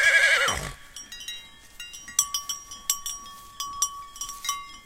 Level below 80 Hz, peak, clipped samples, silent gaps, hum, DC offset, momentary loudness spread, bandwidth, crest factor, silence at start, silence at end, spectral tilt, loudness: -52 dBFS; -6 dBFS; under 0.1%; none; none; under 0.1%; 20 LU; 17 kHz; 22 dB; 0 s; 0.05 s; 1 dB/octave; -26 LUFS